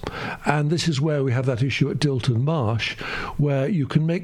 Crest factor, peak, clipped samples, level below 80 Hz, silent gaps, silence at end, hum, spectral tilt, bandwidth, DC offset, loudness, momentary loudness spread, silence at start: 18 dB; -4 dBFS; under 0.1%; -46 dBFS; none; 0 s; none; -6.5 dB/octave; 11 kHz; under 0.1%; -23 LUFS; 5 LU; 0 s